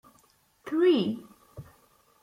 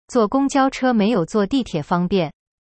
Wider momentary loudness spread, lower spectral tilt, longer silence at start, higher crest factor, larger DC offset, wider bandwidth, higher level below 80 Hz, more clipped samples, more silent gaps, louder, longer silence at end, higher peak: first, 26 LU vs 5 LU; about the same, -7 dB/octave vs -6 dB/octave; first, 0.65 s vs 0.1 s; about the same, 16 dB vs 14 dB; neither; first, 12.5 kHz vs 8.8 kHz; second, -68 dBFS vs -48 dBFS; neither; neither; second, -26 LUFS vs -19 LUFS; first, 0.6 s vs 0.35 s; second, -14 dBFS vs -6 dBFS